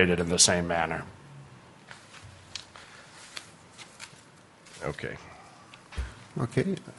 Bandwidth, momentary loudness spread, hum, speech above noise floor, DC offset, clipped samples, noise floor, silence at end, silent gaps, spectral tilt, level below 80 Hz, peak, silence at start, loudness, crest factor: 11.5 kHz; 29 LU; none; 27 dB; under 0.1%; under 0.1%; -54 dBFS; 0.05 s; none; -3 dB/octave; -50 dBFS; -4 dBFS; 0 s; -27 LUFS; 28 dB